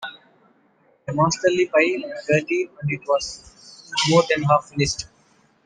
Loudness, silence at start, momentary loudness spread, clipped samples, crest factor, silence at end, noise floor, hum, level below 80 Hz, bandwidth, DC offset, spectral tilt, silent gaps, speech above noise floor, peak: -21 LUFS; 0 s; 14 LU; under 0.1%; 20 dB; 0.6 s; -60 dBFS; none; -52 dBFS; 10 kHz; under 0.1%; -4.5 dB/octave; none; 39 dB; -4 dBFS